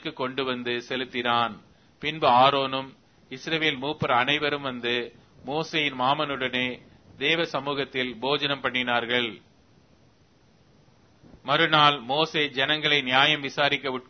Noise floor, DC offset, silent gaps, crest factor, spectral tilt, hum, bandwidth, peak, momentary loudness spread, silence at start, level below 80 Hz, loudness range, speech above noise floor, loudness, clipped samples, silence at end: -60 dBFS; under 0.1%; none; 24 dB; -4.5 dB/octave; none; 6.6 kHz; -2 dBFS; 12 LU; 0.05 s; -64 dBFS; 5 LU; 35 dB; -24 LUFS; under 0.1%; 0.05 s